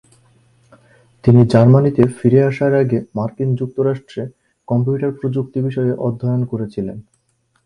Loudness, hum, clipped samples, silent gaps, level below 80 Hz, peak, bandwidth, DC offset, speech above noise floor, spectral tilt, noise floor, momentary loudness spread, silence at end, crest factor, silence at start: -16 LUFS; none; under 0.1%; none; -48 dBFS; 0 dBFS; 10 kHz; under 0.1%; 48 dB; -9.5 dB/octave; -63 dBFS; 14 LU; 0.65 s; 16 dB; 1.25 s